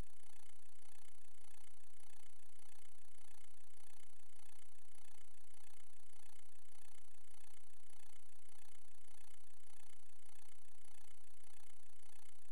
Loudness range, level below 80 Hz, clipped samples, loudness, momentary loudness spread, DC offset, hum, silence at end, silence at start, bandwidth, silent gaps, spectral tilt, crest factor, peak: 0 LU; -82 dBFS; under 0.1%; -67 LUFS; 2 LU; 2%; 50 Hz at -80 dBFS; 0 s; 0 s; 15.5 kHz; none; -3.5 dB/octave; 18 dB; -34 dBFS